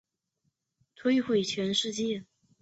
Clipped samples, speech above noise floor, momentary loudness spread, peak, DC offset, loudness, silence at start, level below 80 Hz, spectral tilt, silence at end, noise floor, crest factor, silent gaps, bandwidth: under 0.1%; 51 dB; 7 LU; -16 dBFS; under 0.1%; -29 LUFS; 1 s; -70 dBFS; -4 dB/octave; 0.4 s; -79 dBFS; 16 dB; none; 8.2 kHz